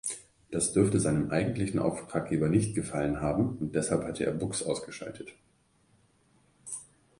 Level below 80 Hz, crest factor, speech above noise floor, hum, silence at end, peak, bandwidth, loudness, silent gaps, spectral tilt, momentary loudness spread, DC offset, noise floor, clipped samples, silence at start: -54 dBFS; 20 dB; 37 dB; none; 0.35 s; -10 dBFS; 11.5 kHz; -30 LUFS; none; -5.5 dB/octave; 15 LU; under 0.1%; -67 dBFS; under 0.1%; 0.05 s